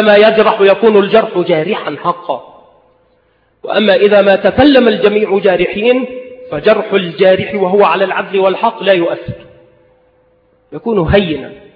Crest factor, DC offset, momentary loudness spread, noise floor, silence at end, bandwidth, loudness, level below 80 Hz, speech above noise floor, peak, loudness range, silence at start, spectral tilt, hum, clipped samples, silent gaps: 12 dB; under 0.1%; 15 LU; -55 dBFS; 0.15 s; 5.2 kHz; -11 LUFS; -38 dBFS; 44 dB; 0 dBFS; 5 LU; 0 s; -8.5 dB/octave; none; under 0.1%; none